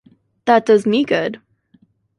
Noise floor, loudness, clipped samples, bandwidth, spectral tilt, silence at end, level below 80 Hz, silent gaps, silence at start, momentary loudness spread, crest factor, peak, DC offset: -56 dBFS; -16 LUFS; under 0.1%; 11.5 kHz; -5.5 dB/octave; 0.85 s; -64 dBFS; none; 0.45 s; 13 LU; 16 dB; -2 dBFS; under 0.1%